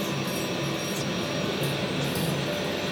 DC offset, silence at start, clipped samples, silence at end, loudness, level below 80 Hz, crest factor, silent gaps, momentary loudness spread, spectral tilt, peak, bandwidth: under 0.1%; 0 s; under 0.1%; 0 s; -28 LUFS; -56 dBFS; 12 dB; none; 1 LU; -4.5 dB/octave; -16 dBFS; over 20 kHz